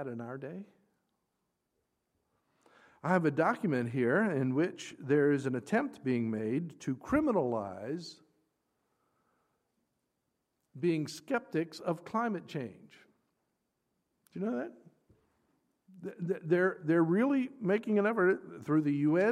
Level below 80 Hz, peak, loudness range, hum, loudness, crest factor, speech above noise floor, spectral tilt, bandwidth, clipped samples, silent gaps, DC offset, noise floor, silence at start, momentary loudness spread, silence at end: -70 dBFS; -14 dBFS; 12 LU; none; -32 LUFS; 20 dB; 51 dB; -7.5 dB/octave; 13 kHz; under 0.1%; none; under 0.1%; -83 dBFS; 0 s; 14 LU; 0 s